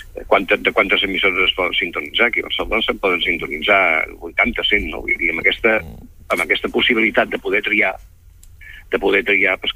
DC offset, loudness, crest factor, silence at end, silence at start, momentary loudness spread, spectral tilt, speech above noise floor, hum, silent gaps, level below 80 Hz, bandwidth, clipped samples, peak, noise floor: under 0.1%; -16 LUFS; 16 dB; 0.05 s; 0 s; 6 LU; -4 dB/octave; 26 dB; none; none; -40 dBFS; 16 kHz; under 0.1%; -2 dBFS; -43 dBFS